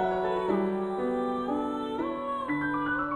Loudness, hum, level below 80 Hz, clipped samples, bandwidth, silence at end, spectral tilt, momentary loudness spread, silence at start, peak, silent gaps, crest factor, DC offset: -30 LUFS; none; -58 dBFS; under 0.1%; 10.5 kHz; 0 s; -7.5 dB/octave; 4 LU; 0 s; -16 dBFS; none; 14 dB; under 0.1%